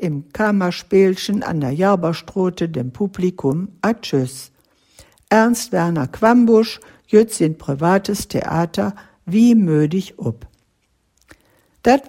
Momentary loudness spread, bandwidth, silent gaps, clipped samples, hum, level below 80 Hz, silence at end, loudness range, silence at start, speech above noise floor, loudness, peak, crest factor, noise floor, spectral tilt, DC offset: 10 LU; 16 kHz; none; under 0.1%; none; -50 dBFS; 0.05 s; 4 LU; 0 s; 48 dB; -18 LUFS; 0 dBFS; 16 dB; -65 dBFS; -6 dB/octave; under 0.1%